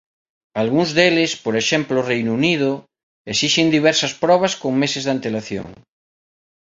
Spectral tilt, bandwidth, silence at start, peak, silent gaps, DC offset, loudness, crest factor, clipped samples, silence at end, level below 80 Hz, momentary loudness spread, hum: -4 dB/octave; 8 kHz; 0.55 s; -2 dBFS; 3.03-3.25 s; under 0.1%; -18 LUFS; 18 dB; under 0.1%; 0.95 s; -58 dBFS; 11 LU; none